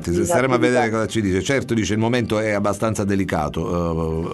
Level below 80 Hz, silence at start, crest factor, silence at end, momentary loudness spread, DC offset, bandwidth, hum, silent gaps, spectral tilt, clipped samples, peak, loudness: -40 dBFS; 0 s; 16 dB; 0 s; 6 LU; under 0.1%; 12.5 kHz; none; none; -5.5 dB/octave; under 0.1%; -4 dBFS; -20 LUFS